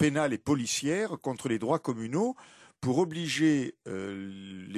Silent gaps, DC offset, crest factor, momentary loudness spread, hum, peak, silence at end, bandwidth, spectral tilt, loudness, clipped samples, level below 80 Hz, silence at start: none; under 0.1%; 16 dB; 12 LU; none; -12 dBFS; 0 s; 13.5 kHz; -5 dB/octave; -30 LUFS; under 0.1%; -64 dBFS; 0 s